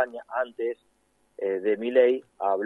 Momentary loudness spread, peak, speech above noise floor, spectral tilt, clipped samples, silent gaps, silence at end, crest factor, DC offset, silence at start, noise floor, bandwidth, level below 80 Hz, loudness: 11 LU; -8 dBFS; 25 dB; -6.5 dB/octave; under 0.1%; none; 0 s; 18 dB; under 0.1%; 0 s; -50 dBFS; 4 kHz; -78 dBFS; -26 LUFS